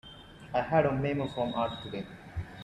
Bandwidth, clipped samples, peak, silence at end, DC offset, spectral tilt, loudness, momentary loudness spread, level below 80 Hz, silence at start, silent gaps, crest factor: 11.5 kHz; under 0.1%; -12 dBFS; 0 s; under 0.1%; -7.5 dB/octave; -31 LUFS; 15 LU; -54 dBFS; 0.05 s; none; 20 dB